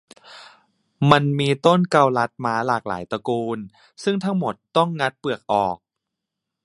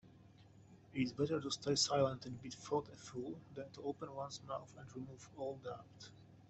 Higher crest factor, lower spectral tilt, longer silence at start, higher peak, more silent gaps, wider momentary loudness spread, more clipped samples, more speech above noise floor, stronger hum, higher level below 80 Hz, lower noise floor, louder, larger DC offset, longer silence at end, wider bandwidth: about the same, 22 dB vs 22 dB; first, -6.5 dB/octave vs -4 dB/octave; first, 0.3 s vs 0.05 s; first, 0 dBFS vs -20 dBFS; neither; second, 11 LU vs 17 LU; neither; first, 62 dB vs 21 dB; neither; first, -60 dBFS vs -72 dBFS; first, -83 dBFS vs -63 dBFS; first, -21 LUFS vs -42 LUFS; neither; first, 0.9 s vs 0 s; first, 11.5 kHz vs 8.2 kHz